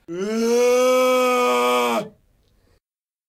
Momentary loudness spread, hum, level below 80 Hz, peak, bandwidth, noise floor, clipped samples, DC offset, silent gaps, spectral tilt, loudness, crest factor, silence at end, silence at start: 9 LU; none; -64 dBFS; -8 dBFS; 16 kHz; under -90 dBFS; under 0.1%; under 0.1%; none; -3 dB/octave; -18 LUFS; 12 dB; 1.2 s; 0.1 s